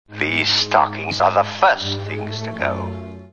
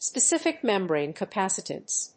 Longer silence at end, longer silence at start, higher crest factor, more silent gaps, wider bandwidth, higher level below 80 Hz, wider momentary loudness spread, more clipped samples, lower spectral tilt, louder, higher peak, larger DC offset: about the same, 0.05 s vs 0.1 s; about the same, 0.1 s vs 0 s; about the same, 18 dB vs 16 dB; neither; about the same, 9 kHz vs 8.8 kHz; first, -56 dBFS vs -78 dBFS; first, 12 LU vs 7 LU; neither; first, -4 dB/octave vs -2.5 dB/octave; first, -19 LUFS vs -26 LUFS; first, -2 dBFS vs -10 dBFS; first, 0.4% vs under 0.1%